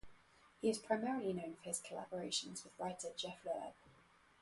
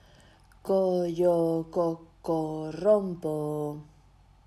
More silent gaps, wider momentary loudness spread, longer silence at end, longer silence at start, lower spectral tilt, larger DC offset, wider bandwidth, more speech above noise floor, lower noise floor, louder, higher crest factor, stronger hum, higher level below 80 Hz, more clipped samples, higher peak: neither; second, 8 LU vs 11 LU; about the same, 0.5 s vs 0.6 s; second, 0.05 s vs 0.65 s; second, -3.5 dB/octave vs -8.5 dB/octave; neither; second, 11.5 kHz vs 13 kHz; second, 26 dB vs 31 dB; first, -69 dBFS vs -58 dBFS; second, -43 LUFS vs -28 LUFS; about the same, 22 dB vs 18 dB; neither; second, -76 dBFS vs -60 dBFS; neither; second, -22 dBFS vs -12 dBFS